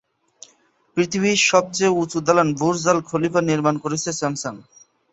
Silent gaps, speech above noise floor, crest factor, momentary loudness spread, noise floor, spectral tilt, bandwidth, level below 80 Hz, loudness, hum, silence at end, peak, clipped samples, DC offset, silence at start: none; 40 dB; 20 dB; 8 LU; -59 dBFS; -4 dB/octave; 8.2 kHz; -60 dBFS; -20 LUFS; none; 0.5 s; -2 dBFS; under 0.1%; under 0.1%; 0.95 s